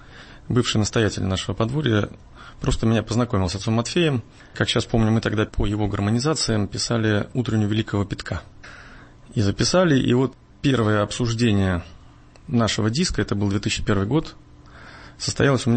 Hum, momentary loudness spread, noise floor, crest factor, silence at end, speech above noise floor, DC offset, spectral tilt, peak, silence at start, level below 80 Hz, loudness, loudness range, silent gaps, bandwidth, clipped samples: none; 9 LU; -47 dBFS; 16 dB; 0 s; 26 dB; under 0.1%; -5.5 dB/octave; -6 dBFS; 0 s; -38 dBFS; -22 LUFS; 3 LU; none; 8.8 kHz; under 0.1%